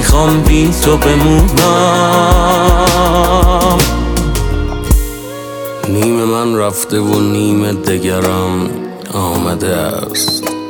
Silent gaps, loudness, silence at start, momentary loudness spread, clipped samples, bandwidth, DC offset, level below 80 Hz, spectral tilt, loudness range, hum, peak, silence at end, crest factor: none; -12 LUFS; 0 s; 8 LU; under 0.1%; over 20 kHz; under 0.1%; -18 dBFS; -5 dB/octave; 5 LU; none; 0 dBFS; 0 s; 12 dB